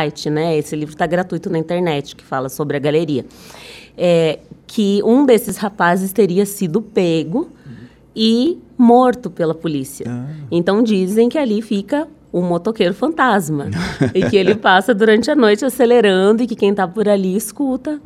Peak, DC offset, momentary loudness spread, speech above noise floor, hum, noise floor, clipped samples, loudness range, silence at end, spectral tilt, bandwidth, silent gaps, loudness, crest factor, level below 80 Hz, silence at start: 0 dBFS; under 0.1%; 11 LU; 22 dB; none; -38 dBFS; under 0.1%; 6 LU; 0.05 s; -5.5 dB/octave; 15.5 kHz; none; -16 LUFS; 16 dB; -50 dBFS; 0 s